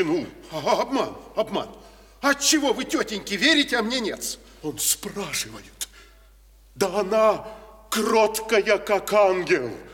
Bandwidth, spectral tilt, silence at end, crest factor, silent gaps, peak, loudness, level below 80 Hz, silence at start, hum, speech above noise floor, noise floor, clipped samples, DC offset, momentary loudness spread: 18.5 kHz; -2.5 dB/octave; 0 s; 18 dB; none; -6 dBFS; -23 LUFS; -54 dBFS; 0 s; none; 29 dB; -52 dBFS; under 0.1%; under 0.1%; 15 LU